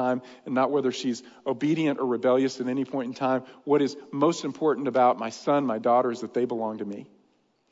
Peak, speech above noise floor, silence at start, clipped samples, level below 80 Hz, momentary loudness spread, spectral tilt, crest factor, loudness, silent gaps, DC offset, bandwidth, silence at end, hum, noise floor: -10 dBFS; 41 dB; 0 s; under 0.1%; -80 dBFS; 9 LU; -6 dB/octave; 16 dB; -26 LUFS; none; under 0.1%; 7.8 kHz; 0.65 s; none; -67 dBFS